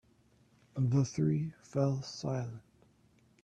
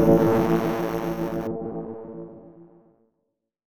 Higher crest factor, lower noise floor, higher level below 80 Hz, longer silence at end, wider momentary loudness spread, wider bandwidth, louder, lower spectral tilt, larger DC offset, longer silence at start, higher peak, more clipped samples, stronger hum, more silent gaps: about the same, 18 dB vs 20 dB; second, -67 dBFS vs -78 dBFS; second, -66 dBFS vs -48 dBFS; about the same, 0.85 s vs 0.95 s; second, 13 LU vs 20 LU; second, 8.6 kHz vs 19.5 kHz; second, -34 LUFS vs -24 LUFS; about the same, -7.5 dB/octave vs -8 dB/octave; neither; first, 0.75 s vs 0 s; second, -16 dBFS vs -4 dBFS; neither; neither; neither